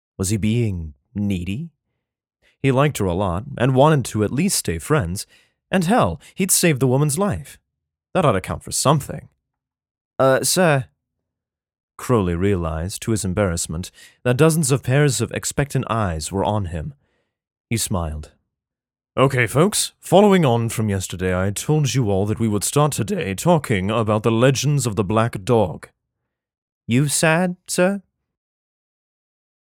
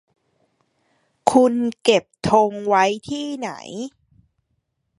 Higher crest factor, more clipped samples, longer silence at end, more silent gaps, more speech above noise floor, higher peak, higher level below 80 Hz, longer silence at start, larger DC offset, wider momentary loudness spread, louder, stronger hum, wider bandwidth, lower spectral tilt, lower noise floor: about the same, 20 dB vs 22 dB; neither; first, 1.75 s vs 1.1 s; first, 9.91-9.95 s, 10.01-10.11 s, 11.83-11.88 s, 17.60-17.64 s, 26.58-26.81 s vs none; first, 67 dB vs 53 dB; about the same, 0 dBFS vs 0 dBFS; first, -44 dBFS vs -58 dBFS; second, 0.2 s vs 1.25 s; neither; second, 11 LU vs 15 LU; about the same, -19 LUFS vs -19 LUFS; neither; first, 18 kHz vs 11.5 kHz; about the same, -5 dB/octave vs -4.5 dB/octave; first, -86 dBFS vs -72 dBFS